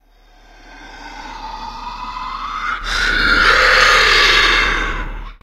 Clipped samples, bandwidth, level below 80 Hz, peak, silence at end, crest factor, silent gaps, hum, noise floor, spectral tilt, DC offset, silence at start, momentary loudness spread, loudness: under 0.1%; 15.5 kHz; -28 dBFS; 0 dBFS; 0.1 s; 16 dB; none; none; -47 dBFS; -1.5 dB/octave; under 0.1%; 0.65 s; 21 LU; -12 LUFS